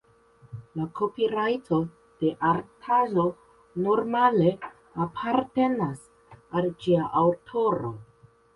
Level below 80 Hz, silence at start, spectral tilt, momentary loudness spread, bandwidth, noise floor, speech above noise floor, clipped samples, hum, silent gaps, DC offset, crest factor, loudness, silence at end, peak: -62 dBFS; 0.5 s; -8 dB/octave; 15 LU; 11.5 kHz; -57 dBFS; 33 dB; under 0.1%; none; none; under 0.1%; 18 dB; -26 LUFS; 0.55 s; -8 dBFS